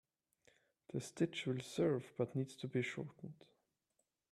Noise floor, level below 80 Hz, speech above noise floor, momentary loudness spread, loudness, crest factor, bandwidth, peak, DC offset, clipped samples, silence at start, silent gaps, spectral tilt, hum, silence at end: -86 dBFS; -80 dBFS; 45 dB; 12 LU; -41 LUFS; 20 dB; 13 kHz; -24 dBFS; under 0.1%; under 0.1%; 0.95 s; none; -6 dB/octave; none; 1 s